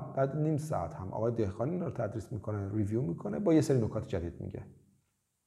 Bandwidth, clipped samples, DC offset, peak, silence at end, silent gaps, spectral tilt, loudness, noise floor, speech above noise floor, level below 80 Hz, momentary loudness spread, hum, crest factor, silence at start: 13 kHz; under 0.1%; under 0.1%; -14 dBFS; 0.7 s; none; -8 dB/octave; -33 LUFS; -77 dBFS; 44 dB; -62 dBFS; 11 LU; none; 18 dB; 0 s